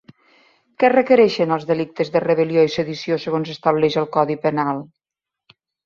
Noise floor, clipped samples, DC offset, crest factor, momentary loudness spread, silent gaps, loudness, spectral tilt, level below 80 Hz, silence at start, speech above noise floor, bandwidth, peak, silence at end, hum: -87 dBFS; under 0.1%; under 0.1%; 18 dB; 9 LU; none; -19 LUFS; -6.5 dB/octave; -62 dBFS; 0.8 s; 69 dB; 7.2 kHz; -2 dBFS; 1 s; none